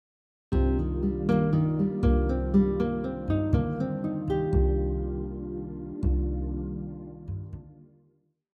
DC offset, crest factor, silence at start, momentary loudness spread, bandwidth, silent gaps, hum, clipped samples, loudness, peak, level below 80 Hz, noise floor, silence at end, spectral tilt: under 0.1%; 16 dB; 0.5 s; 13 LU; 4.8 kHz; none; none; under 0.1%; -28 LUFS; -12 dBFS; -32 dBFS; -68 dBFS; 0.7 s; -10.5 dB/octave